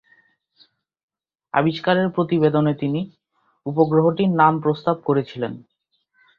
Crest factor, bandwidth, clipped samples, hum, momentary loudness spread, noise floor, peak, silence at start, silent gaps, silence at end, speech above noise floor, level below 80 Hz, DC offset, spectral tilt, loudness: 20 dB; 5.6 kHz; under 0.1%; none; 12 LU; -67 dBFS; -2 dBFS; 1.55 s; none; 0.8 s; 48 dB; -62 dBFS; under 0.1%; -9.5 dB/octave; -20 LUFS